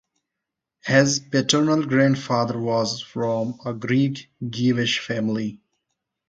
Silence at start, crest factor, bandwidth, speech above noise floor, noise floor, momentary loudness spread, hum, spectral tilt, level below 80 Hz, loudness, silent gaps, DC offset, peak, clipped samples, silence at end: 0.85 s; 22 dB; 9.2 kHz; 62 dB; -84 dBFS; 10 LU; none; -4.5 dB/octave; -62 dBFS; -22 LUFS; none; under 0.1%; -2 dBFS; under 0.1%; 0.75 s